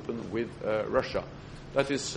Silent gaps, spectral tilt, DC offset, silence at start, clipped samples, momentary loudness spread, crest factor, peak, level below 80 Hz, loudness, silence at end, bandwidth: none; -4.5 dB/octave; under 0.1%; 0 s; under 0.1%; 10 LU; 20 dB; -10 dBFS; -52 dBFS; -31 LUFS; 0 s; 11.5 kHz